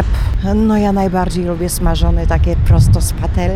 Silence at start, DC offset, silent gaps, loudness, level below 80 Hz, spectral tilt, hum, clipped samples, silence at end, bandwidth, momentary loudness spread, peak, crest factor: 0 s; under 0.1%; none; -15 LUFS; -16 dBFS; -6.5 dB/octave; none; under 0.1%; 0 s; 15.5 kHz; 6 LU; 0 dBFS; 12 dB